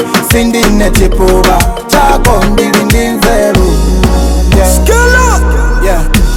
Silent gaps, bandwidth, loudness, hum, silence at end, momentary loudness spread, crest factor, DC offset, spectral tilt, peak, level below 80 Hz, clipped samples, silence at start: none; 17 kHz; -8 LUFS; none; 0 s; 4 LU; 6 dB; under 0.1%; -4.5 dB/octave; 0 dBFS; -10 dBFS; 1%; 0 s